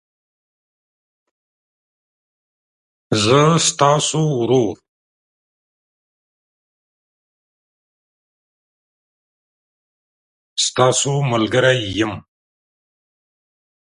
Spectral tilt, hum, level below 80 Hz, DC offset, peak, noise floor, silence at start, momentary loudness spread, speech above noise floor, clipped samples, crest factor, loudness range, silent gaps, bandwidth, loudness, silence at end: -4 dB/octave; none; -56 dBFS; under 0.1%; 0 dBFS; under -90 dBFS; 3.1 s; 9 LU; over 74 dB; under 0.1%; 22 dB; 8 LU; 4.88-10.57 s; 11.5 kHz; -16 LUFS; 1.7 s